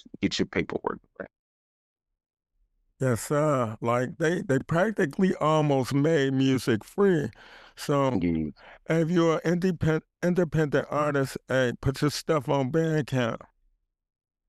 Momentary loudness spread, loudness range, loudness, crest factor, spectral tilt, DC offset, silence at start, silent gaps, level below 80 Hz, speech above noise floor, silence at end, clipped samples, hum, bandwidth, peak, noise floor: 8 LU; 5 LU; -26 LUFS; 16 dB; -6.5 dB/octave; under 0.1%; 0.2 s; 1.39-1.96 s; -54 dBFS; 46 dB; 1.1 s; under 0.1%; none; 15 kHz; -12 dBFS; -71 dBFS